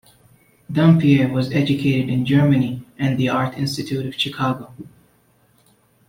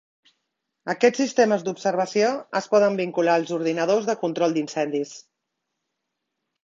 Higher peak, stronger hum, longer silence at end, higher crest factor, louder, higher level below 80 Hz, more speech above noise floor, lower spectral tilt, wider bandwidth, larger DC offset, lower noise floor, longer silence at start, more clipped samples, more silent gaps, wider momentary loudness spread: about the same, -4 dBFS vs -4 dBFS; neither; second, 1.25 s vs 1.45 s; about the same, 16 dB vs 20 dB; first, -19 LUFS vs -22 LUFS; first, -54 dBFS vs -72 dBFS; second, 40 dB vs 58 dB; first, -7 dB/octave vs -4.5 dB/octave; first, 16 kHz vs 7.6 kHz; neither; second, -58 dBFS vs -80 dBFS; second, 0.7 s vs 0.85 s; neither; neither; first, 11 LU vs 7 LU